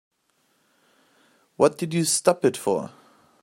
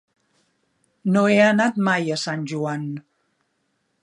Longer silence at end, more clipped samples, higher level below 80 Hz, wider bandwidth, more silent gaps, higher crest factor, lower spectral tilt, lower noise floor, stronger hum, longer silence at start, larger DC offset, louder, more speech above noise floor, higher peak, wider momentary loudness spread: second, 0.55 s vs 1 s; neither; about the same, -70 dBFS vs -72 dBFS; first, 16 kHz vs 11 kHz; neither; about the same, 22 dB vs 20 dB; second, -4 dB/octave vs -5.5 dB/octave; about the same, -68 dBFS vs -71 dBFS; neither; first, 1.6 s vs 1.05 s; neither; about the same, -22 LUFS vs -20 LUFS; second, 46 dB vs 51 dB; about the same, -2 dBFS vs -2 dBFS; second, 7 LU vs 14 LU